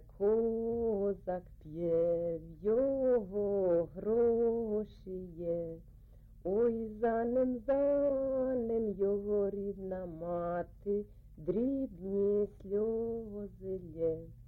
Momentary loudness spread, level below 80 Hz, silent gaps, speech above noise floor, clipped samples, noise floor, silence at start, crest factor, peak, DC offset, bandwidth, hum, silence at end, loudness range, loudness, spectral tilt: 11 LU; -56 dBFS; none; 22 dB; under 0.1%; -56 dBFS; 0 s; 12 dB; -22 dBFS; under 0.1%; 4.1 kHz; none; 0 s; 4 LU; -34 LUFS; -11 dB/octave